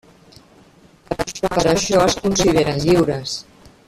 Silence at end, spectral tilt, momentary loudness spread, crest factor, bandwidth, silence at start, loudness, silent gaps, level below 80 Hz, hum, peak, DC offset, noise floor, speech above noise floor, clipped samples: 0.45 s; -4.5 dB/octave; 11 LU; 18 dB; 14.5 kHz; 1.1 s; -18 LUFS; none; -40 dBFS; none; -2 dBFS; under 0.1%; -49 dBFS; 33 dB; under 0.1%